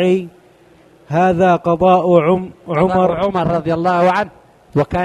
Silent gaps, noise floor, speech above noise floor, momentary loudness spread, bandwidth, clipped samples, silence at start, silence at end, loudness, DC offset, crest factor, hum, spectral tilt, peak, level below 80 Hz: none; -47 dBFS; 33 dB; 9 LU; 10 kHz; under 0.1%; 0 s; 0 s; -15 LUFS; under 0.1%; 16 dB; none; -8 dB/octave; 0 dBFS; -44 dBFS